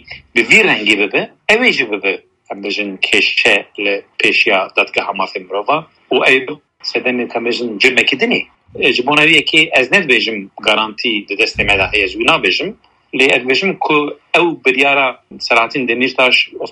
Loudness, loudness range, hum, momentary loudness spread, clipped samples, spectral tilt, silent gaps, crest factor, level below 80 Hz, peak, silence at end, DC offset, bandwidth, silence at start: -12 LUFS; 3 LU; none; 9 LU; under 0.1%; -3 dB/octave; none; 14 dB; -46 dBFS; 0 dBFS; 0 s; under 0.1%; 13 kHz; 0.1 s